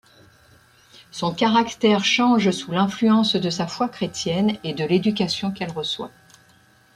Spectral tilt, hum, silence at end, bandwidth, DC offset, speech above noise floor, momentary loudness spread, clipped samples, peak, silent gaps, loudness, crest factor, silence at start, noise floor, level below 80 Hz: -5 dB/octave; none; 0.9 s; 12 kHz; under 0.1%; 35 dB; 10 LU; under 0.1%; -4 dBFS; none; -21 LUFS; 18 dB; 1.15 s; -55 dBFS; -60 dBFS